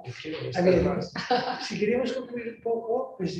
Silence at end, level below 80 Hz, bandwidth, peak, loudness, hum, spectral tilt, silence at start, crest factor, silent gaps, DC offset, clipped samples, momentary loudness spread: 0 s; -52 dBFS; 8.6 kHz; -10 dBFS; -28 LUFS; none; -6 dB/octave; 0 s; 18 dB; none; under 0.1%; under 0.1%; 11 LU